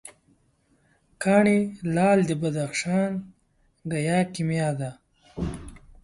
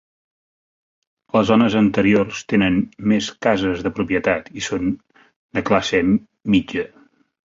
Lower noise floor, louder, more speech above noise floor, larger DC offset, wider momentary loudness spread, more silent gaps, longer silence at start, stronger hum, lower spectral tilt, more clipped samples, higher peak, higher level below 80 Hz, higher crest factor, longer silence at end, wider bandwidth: second, -65 dBFS vs under -90 dBFS; second, -25 LUFS vs -19 LUFS; second, 42 dB vs over 72 dB; neither; first, 15 LU vs 10 LU; second, none vs 5.36-5.49 s; second, 0.05 s vs 1.35 s; neither; about the same, -6.5 dB/octave vs -5.5 dB/octave; neither; second, -6 dBFS vs -2 dBFS; about the same, -50 dBFS vs -48 dBFS; about the same, 20 dB vs 18 dB; second, 0.15 s vs 0.6 s; first, 11.5 kHz vs 7.6 kHz